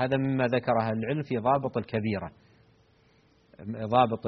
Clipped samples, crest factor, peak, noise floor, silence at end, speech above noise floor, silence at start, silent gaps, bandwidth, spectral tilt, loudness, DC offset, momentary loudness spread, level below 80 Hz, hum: under 0.1%; 20 dB; -8 dBFS; -63 dBFS; 0 s; 35 dB; 0 s; none; 6.2 kHz; -6 dB/octave; -28 LUFS; under 0.1%; 12 LU; -62 dBFS; none